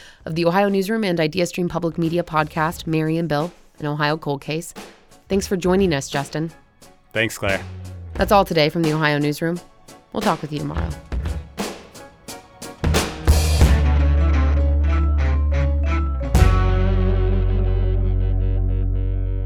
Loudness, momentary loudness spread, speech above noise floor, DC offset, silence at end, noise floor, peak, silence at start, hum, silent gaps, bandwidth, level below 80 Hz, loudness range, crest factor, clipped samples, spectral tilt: -21 LUFS; 13 LU; 29 dB; under 0.1%; 0 s; -50 dBFS; -2 dBFS; 0 s; none; none; 16 kHz; -22 dBFS; 5 LU; 18 dB; under 0.1%; -6 dB/octave